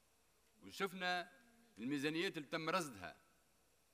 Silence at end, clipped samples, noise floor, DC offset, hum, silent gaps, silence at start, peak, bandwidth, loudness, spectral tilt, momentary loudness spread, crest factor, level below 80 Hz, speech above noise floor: 0.8 s; under 0.1%; -77 dBFS; under 0.1%; none; none; 0.6 s; -26 dBFS; 15.5 kHz; -42 LUFS; -4 dB/octave; 14 LU; 20 dB; -84 dBFS; 34 dB